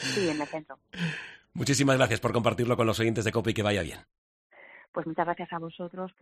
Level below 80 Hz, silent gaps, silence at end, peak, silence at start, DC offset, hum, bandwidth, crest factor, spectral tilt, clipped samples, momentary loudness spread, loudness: -56 dBFS; 4.18-4.50 s, 4.88-4.93 s; 0.1 s; -8 dBFS; 0 s; under 0.1%; none; 15 kHz; 20 dB; -5 dB/octave; under 0.1%; 15 LU; -28 LUFS